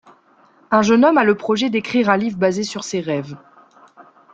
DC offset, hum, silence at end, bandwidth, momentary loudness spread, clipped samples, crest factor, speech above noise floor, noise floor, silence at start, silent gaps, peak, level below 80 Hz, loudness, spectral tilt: under 0.1%; none; 0.3 s; 8.6 kHz; 11 LU; under 0.1%; 18 dB; 36 dB; -53 dBFS; 0.7 s; none; -2 dBFS; -60 dBFS; -17 LUFS; -5 dB/octave